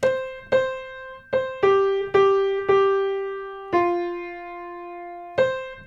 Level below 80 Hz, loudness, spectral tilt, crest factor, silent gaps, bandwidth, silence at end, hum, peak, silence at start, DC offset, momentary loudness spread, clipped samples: -56 dBFS; -22 LUFS; -5.5 dB/octave; 16 dB; none; 7.6 kHz; 0 s; none; -6 dBFS; 0 s; under 0.1%; 17 LU; under 0.1%